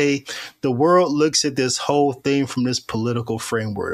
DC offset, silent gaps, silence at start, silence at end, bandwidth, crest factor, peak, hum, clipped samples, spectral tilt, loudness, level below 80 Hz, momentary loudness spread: under 0.1%; none; 0 s; 0 s; 14 kHz; 16 dB; -4 dBFS; none; under 0.1%; -4.5 dB/octave; -20 LUFS; -58 dBFS; 9 LU